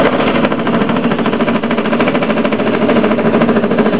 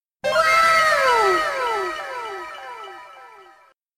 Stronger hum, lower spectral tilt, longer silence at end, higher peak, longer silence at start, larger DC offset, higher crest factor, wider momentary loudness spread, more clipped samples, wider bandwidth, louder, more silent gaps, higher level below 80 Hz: neither; first, -10.5 dB/octave vs -1.5 dB/octave; second, 0 s vs 0.55 s; first, 0 dBFS vs -4 dBFS; second, 0 s vs 0.25 s; first, 4% vs under 0.1%; about the same, 12 dB vs 16 dB; second, 2 LU vs 21 LU; neither; second, 4 kHz vs 15.5 kHz; first, -13 LUFS vs -18 LUFS; neither; first, -44 dBFS vs -56 dBFS